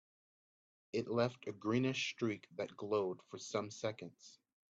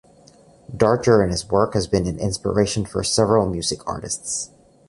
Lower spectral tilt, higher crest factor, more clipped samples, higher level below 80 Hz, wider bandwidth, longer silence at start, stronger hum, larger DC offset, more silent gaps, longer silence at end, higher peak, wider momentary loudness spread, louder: about the same, -5 dB/octave vs -4.5 dB/octave; about the same, 20 dB vs 18 dB; neither; second, -80 dBFS vs -42 dBFS; second, 8 kHz vs 11.5 kHz; first, 0.95 s vs 0.7 s; neither; neither; neither; about the same, 0.35 s vs 0.4 s; second, -22 dBFS vs -2 dBFS; about the same, 11 LU vs 10 LU; second, -40 LUFS vs -20 LUFS